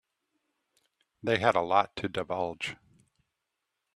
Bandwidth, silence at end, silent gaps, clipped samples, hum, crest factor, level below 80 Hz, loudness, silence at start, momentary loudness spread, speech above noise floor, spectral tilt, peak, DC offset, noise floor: 12.5 kHz; 1.2 s; none; under 0.1%; none; 26 dB; -68 dBFS; -29 LUFS; 1.25 s; 12 LU; 56 dB; -5 dB/octave; -8 dBFS; under 0.1%; -84 dBFS